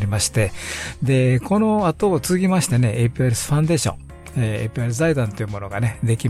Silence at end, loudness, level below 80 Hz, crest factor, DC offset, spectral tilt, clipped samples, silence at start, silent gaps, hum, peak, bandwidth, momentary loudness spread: 0 s; -20 LUFS; -42 dBFS; 12 dB; under 0.1%; -5.5 dB/octave; under 0.1%; 0 s; none; none; -8 dBFS; 14.5 kHz; 8 LU